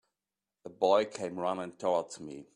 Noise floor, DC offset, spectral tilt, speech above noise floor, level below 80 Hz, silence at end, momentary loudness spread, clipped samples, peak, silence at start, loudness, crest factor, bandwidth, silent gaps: under -90 dBFS; under 0.1%; -4.5 dB/octave; over 59 dB; -76 dBFS; 0.15 s; 18 LU; under 0.1%; -12 dBFS; 0.65 s; -31 LUFS; 20 dB; 11 kHz; none